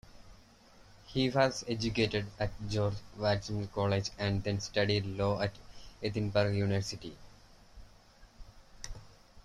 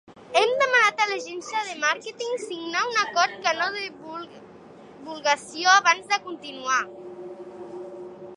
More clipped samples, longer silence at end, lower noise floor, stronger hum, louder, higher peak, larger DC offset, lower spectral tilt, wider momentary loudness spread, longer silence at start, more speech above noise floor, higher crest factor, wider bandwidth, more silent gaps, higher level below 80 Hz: neither; about the same, 0.05 s vs 0 s; first, -59 dBFS vs -46 dBFS; neither; second, -33 LUFS vs -23 LUFS; second, -14 dBFS vs -2 dBFS; neither; first, -5.5 dB/octave vs -0.5 dB/octave; second, 17 LU vs 21 LU; about the same, 0.15 s vs 0.1 s; first, 26 dB vs 21 dB; about the same, 22 dB vs 22 dB; about the same, 11.5 kHz vs 11.5 kHz; neither; first, -52 dBFS vs -74 dBFS